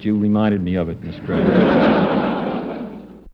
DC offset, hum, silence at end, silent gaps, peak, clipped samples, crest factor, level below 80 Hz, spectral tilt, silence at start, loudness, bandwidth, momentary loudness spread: under 0.1%; none; 0.05 s; none; -2 dBFS; under 0.1%; 16 dB; -44 dBFS; -9.5 dB/octave; 0 s; -18 LUFS; 5.6 kHz; 15 LU